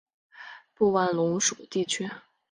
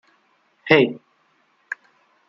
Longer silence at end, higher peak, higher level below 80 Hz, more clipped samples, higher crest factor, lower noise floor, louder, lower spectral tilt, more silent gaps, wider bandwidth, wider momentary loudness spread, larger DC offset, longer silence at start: second, 0.3 s vs 1.35 s; second, -10 dBFS vs -2 dBFS; about the same, -68 dBFS vs -66 dBFS; neither; about the same, 18 dB vs 22 dB; second, -48 dBFS vs -63 dBFS; second, -26 LUFS vs -18 LUFS; second, -3.5 dB/octave vs -7 dB/octave; neither; first, 10.5 kHz vs 7.2 kHz; about the same, 21 LU vs 22 LU; neither; second, 0.35 s vs 0.65 s